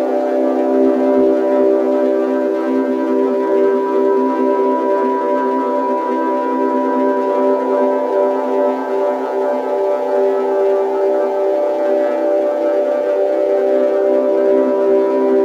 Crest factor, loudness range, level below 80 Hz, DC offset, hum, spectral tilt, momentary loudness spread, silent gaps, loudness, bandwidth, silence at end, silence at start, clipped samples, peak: 12 dB; 2 LU; -68 dBFS; under 0.1%; none; -6 dB/octave; 3 LU; none; -15 LUFS; 7.4 kHz; 0 s; 0 s; under 0.1%; -2 dBFS